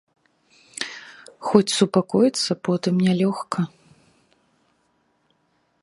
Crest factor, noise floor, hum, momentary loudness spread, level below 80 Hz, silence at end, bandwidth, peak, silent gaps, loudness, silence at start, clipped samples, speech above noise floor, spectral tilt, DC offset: 24 dB; -67 dBFS; none; 14 LU; -66 dBFS; 2.15 s; 11.5 kHz; 0 dBFS; none; -22 LUFS; 0.8 s; under 0.1%; 47 dB; -5.5 dB/octave; under 0.1%